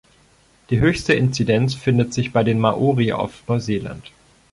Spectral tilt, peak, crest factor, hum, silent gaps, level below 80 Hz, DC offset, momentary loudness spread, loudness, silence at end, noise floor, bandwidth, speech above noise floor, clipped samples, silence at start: -6.5 dB/octave; -4 dBFS; 16 dB; none; none; -44 dBFS; under 0.1%; 8 LU; -19 LUFS; 0.45 s; -55 dBFS; 11.5 kHz; 36 dB; under 0.1%; 0.7 s